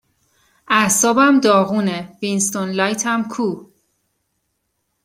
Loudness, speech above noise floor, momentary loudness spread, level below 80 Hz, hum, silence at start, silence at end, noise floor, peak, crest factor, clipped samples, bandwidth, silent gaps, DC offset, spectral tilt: -17 LUFS; 55 dB; 11 LU; -62 dBFS; none; 0.7 s; 1.4 s; -71 dBFS; -2 dBFS; 18 dB; under 0.1%; 16.5 kHz; none; under 0.1%; -3.5 dB/octave